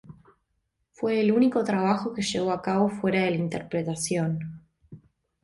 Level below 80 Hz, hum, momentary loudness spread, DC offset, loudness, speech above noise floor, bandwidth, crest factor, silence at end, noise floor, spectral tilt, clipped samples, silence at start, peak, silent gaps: -62 dBFS; none; 8 LU; under 0.1%; -26 LUFS; 51 dB; 11.5 kHz; 16 dB; 0.45 s; -76 dBFS; -5.5 dB/octave; under 0.1%; 0.1 s; -10 dBFS; none